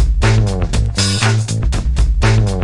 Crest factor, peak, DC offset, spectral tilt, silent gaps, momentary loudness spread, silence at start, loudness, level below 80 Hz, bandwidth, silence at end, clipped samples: 12 dB; 0 dBFS; 0.3%; -5 dB/octave; none; 4 LU; 0 s; -15 LUFS; -16 dBFS; 11.5 kHz; 0 s; under 0.1%